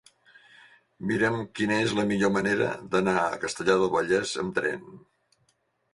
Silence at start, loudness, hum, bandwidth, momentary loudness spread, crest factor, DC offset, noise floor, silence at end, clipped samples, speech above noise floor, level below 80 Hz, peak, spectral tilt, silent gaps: 1 s; -26 LUFS; none; 11.5 kHz; 5 LU; 20 dB; under 0.1%; -71 dBFS; 0.95 s; under 0.1%; 45 dB; -60 dBFS; -8 dBFS; -5 dB/octave; none